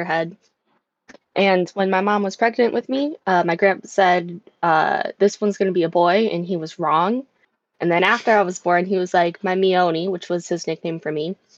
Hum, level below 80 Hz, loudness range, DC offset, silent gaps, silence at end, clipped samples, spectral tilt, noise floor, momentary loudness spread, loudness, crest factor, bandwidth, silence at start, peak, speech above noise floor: none; -72 dBFS; 2 LU; under 0.1%; none; 0.25 s; under 0.1%; -5.5 dB/octave; -69 dBFS; 9 LU; -20 LUFS; 16 dB; 8 kHz; 0 s; -4 dBFS; 49 dB